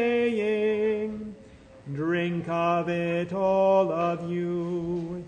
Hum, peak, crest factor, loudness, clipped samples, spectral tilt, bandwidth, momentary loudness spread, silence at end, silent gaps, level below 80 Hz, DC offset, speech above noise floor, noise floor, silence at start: none; -10 dBFS; 16 dB; -26 LUFS; under 0.1%; -7.5 dB/octave; 9.4 kHz; 10 LU; 0 s; none; -60 dBFS; under 0.1%; 24 dB; -49 dBFS; 0 s